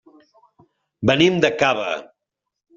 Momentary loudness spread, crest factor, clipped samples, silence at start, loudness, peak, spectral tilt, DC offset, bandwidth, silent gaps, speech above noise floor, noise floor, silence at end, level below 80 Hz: 11 LU; 20 dB; under 0.1%; 1 s; -19 LUFS; -2 dBFS; -5 dB/octave; under 0.1%; 7.6 kHz; none; 64 dB; -82 dBFS; 0.75 s; -58 dBFS